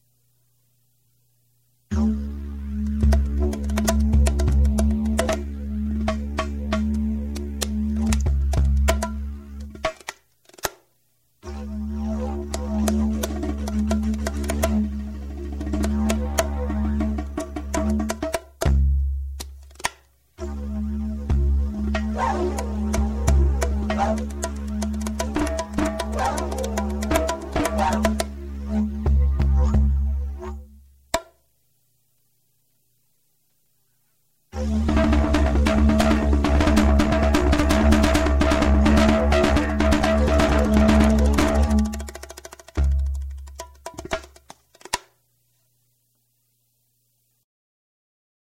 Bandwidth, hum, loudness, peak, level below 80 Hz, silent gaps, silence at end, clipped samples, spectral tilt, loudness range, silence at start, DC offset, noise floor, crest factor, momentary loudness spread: 15.5 kHz; none; -23 LUFS; -2 dBFS; -26 dBFS; none; 3.4 s; under 0.1%; -6 dB/octave; 13 LU; 1.9 s; under 0.1%; -69 dBFS; 20 dB; 14 LU